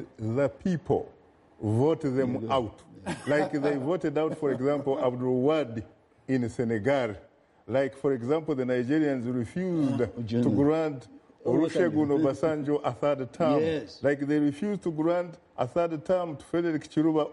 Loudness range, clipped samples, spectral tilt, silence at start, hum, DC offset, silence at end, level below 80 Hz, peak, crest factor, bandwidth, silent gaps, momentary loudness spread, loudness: 2 LU; under 0.1%; -7.5 dB/octave; 0 s; none; under 0.1%; 0 s; -62 dBFS; -14 dBFS; 14 dB; 11.5 kHz; none; 6 LU; -28 LUFS